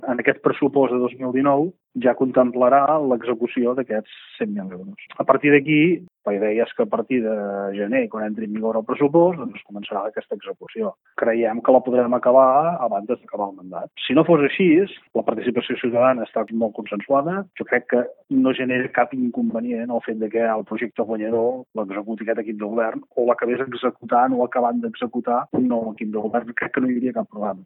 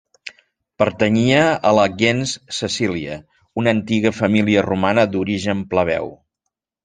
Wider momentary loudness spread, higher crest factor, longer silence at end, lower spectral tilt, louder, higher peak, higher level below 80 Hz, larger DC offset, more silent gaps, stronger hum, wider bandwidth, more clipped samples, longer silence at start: second, 12 LU vs 15 LU; about the same, 20 dB vs 18 dB; second, 0 s vs 0.7 s; first, -11 dB/octave vs -5.5 dB/octave; second, -21 LUFS vs -18 LUFS; about the same, 0 dBFS vs -2 dBFS; second, -70 dBFS vs -54 dBFS; neither; neither; neither; second, 4.1 kHz vs 9.8 kHz; neither; second, 0 s vs 0.25 s